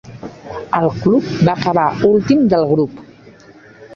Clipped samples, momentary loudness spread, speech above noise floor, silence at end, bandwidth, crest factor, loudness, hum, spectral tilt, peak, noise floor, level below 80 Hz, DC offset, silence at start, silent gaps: under 0.1%; 17 LU; 28 dB; 0 s; 7.2 kHz; 14 dB; -15 LUFS; none; -8 dB/octave; -2 dBFS; -42 dBFS; -46 dBFS; under 0.1%; 0.05 s; none